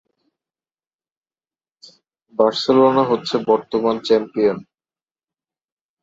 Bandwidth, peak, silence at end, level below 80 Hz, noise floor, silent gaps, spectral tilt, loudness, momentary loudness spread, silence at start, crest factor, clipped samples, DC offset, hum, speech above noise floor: 7.8 kHz; -2 dBFS; 1.4 s; -64 dBFS; under -90 dBFS; none; -6 dB/octave; -17 LUFS; 6 LU; 2.4 s; 18 dB; under 0.1%; under 0.1%; none; over 73 dB